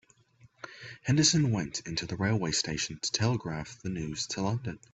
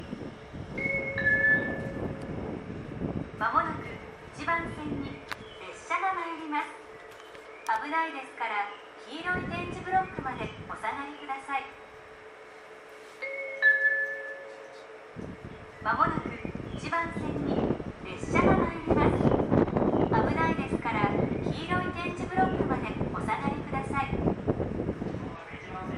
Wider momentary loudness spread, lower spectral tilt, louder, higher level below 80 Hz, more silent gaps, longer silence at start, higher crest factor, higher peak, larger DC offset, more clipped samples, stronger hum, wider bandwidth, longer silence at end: second, 15 LU vs 20 LU; second, -4 dB/octave vs -7 dB/octave; about the same, -30 LUFS vs -30 LUFS; second, -56 dBFS vs -48 dBFS; neither; first, 0.65 s vs 0 s; about the same, 20 dB vs 22 dB; about the same, -10 dBFS vs -8 dBFS; neither; neither; neither; second, 8.4 kHz vs 12.5 kHz; first, 0.15 s vs 0 s